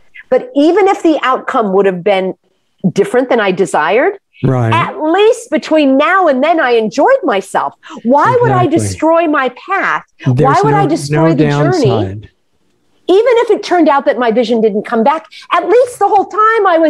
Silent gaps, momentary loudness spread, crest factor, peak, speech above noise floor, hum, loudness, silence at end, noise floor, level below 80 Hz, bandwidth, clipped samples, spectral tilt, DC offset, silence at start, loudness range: none; 7 LU; 10 dB; 0 dBFS; 50 dB; none; -11 LUFS; 0 s; -61 dBFS; -50 dBFS; 12.5 kHz; under 0.1%; -6.5 dB/octave; under 0.1%; 0.15 s; 2 LU